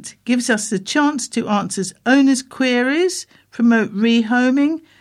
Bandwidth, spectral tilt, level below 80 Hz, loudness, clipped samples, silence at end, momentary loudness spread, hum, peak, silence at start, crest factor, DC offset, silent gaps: 13 kHz; -4 dB/octave; -66 dBFS; -17 LUFS; under 0.1%; 0.2 s; 7 LU; none; -2 dBFS; 0 s; 16 dB; under 0.1%; none